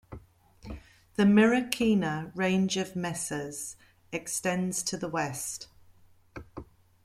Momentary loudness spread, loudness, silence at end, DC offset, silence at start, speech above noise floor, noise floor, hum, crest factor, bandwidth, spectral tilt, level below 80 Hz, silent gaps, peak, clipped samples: 24 LU; -28 LUFS; 0.4 s; under 0.1%; 0.1 s; 31 dB; -58 dBFS; none; 24 dB; 15.5 kHz; -4.5 dB/octave; -58 dBFS; none; -6 dBFS; under 0.1%